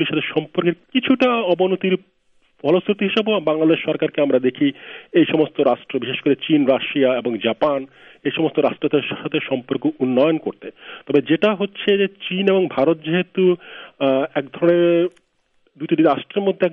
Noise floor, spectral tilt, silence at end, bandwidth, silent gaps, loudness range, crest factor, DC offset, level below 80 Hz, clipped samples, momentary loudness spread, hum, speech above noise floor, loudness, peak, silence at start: -62 dBFS; -8.5 dB/octave; 0 s; 5.6 kHz; none; 2 LU; 16 dB; under 0.1%; -66 dBFS; under 0.1%; 8 LU; none; 44 dB; -19 LUFS; -2 dBFS; 0 s